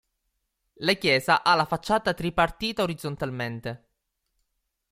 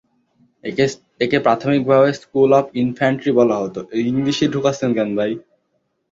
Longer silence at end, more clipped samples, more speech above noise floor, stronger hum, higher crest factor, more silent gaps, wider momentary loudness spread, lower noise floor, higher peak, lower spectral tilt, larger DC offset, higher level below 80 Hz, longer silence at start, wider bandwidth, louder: first, 1.15 s vs 0.7 s; neither; about the same, 53 dB vs 52 dB; neither; about the same, 20 dB vs 16 dB; neither; about the same, 11 LU vs 9 LU; first, -78 dBFS vs -69 dBFS; second, -8 dBFS vs -2 dBFS; second, -4.5 dB/octave vs -6 dB/octave; neither; about the same, -52 dBFS vs -56 dBFS; first, 0.8 s vs 0.65 s; first, 16.5 kHz vs 7.8 kHz; second, -25 LUFS vs -18 LUFS